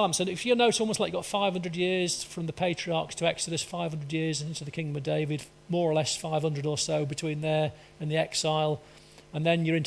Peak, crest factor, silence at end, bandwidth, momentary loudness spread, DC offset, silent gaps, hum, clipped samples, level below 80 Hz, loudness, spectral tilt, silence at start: -10 dBFS; 18 dB; 0 s; 11 kHz; 8 LU; under 0.1%; none; none; under 0.1%; -62 dBFS; -29 LUFS; -4.5 dB/octave; 0 s